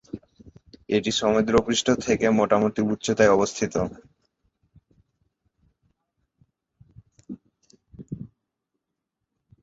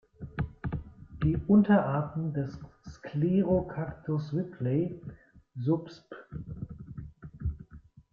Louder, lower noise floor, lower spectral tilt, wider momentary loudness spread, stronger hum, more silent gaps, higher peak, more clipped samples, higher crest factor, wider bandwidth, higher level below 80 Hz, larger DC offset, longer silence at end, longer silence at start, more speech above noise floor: first, -22 LUFS vs -30 LUFS; first, -83 dBFS vs -53 dBFS; second, -4.5 dB/octave vs -10 dB/octave; about the same, 23 LU vs 22 LU; neither; neither; first, -4 dBFS vs -12 dBFS; neither; about the same, 22 dB vs 18 dB; first, 8 kHz vs 6.6 kHz; second, -54 dBFS vs -48 dBFS; neither; first, 1.35 s vs 0.35 s; about the same, 0.15 s vs 0.2 s; first, 61 dB vs 25 dB